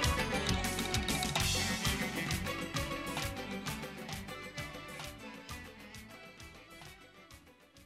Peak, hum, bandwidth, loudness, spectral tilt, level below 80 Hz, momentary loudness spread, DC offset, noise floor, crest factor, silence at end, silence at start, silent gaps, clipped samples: -18 dBFS; none; 16 kHz; -36 LUFS; -3.5 dB/octave; -48 dBFS; 20 LU; under 0.1%; -59 dBFS; 20 dB; 0 s; 0 s; none; under 0.1%